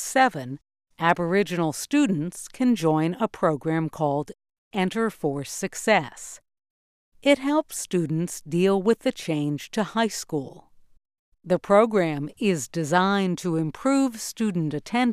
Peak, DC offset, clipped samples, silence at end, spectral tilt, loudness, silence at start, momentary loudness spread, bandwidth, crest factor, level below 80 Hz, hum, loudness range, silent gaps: -4 dBFS; under 0.1%; under 0.1%; 0 s; -5 dB/octave; -24 LUFS; 0 s; 9 LU; 15.5 kHz; 20 dB; -62 dBFS; none; 3 LU; 4.58-4.71 s, 6.70-7.12 s, 11.19-11.32 s